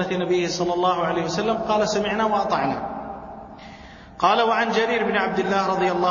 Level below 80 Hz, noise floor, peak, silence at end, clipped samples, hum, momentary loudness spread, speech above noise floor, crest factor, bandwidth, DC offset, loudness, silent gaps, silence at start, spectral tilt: -52 dBFS; -42 dBFS; -4 dBFS; 0 s; under 0.1%; none; 19 LU; 21 dB; 18 dB; 7.4 kHz; under 0.1%; -22 LUFS; none; 0 s; -4.5 dB/octave